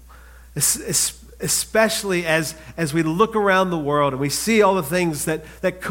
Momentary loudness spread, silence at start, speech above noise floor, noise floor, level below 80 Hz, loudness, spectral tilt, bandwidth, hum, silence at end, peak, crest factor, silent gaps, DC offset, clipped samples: 9 LU; 0.1 s; 24 dB; -44 dBFS; -46 dBFS; -20 LUFS; -3.5 dB/octave; 17 kHz; none; 0 s; -2 dBFS; 18 dB; none; under 0.1%; under 0.1%